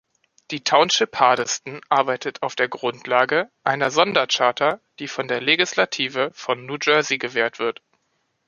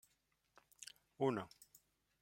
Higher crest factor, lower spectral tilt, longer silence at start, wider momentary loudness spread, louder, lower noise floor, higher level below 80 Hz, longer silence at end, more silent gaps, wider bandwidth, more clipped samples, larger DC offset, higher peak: about the same, 20 dB vs 22 dB; second, -2.5 dB/octave vs -5.5 dB/octave; second, 0.5 s vs 0.8 s; second, 10 LU vs 22 LU; first, -20 LUFS vs -42 LUFS; second, -71 dBFS vs -82 dBFS; first, -70 dBFS vs -84 dBFS; about the same, 0.75 s vs 0.75 s; neither; second, 10 kHz vs 16.5 kHz; neither; neither; first, 0 dBFS vs -24 dBFS